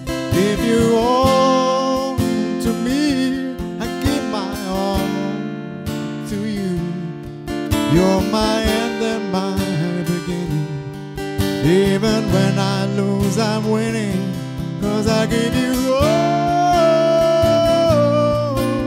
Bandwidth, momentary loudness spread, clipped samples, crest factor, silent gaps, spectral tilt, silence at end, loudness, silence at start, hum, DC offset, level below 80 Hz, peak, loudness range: 16 kHz; 11 LU; under 0.1%; 16 dB; none; -6 dB/octave; 0 s; -18 LUFS; 0 s; none; under 0.1%; -36 dBFS; 0 dBFS; 7 LU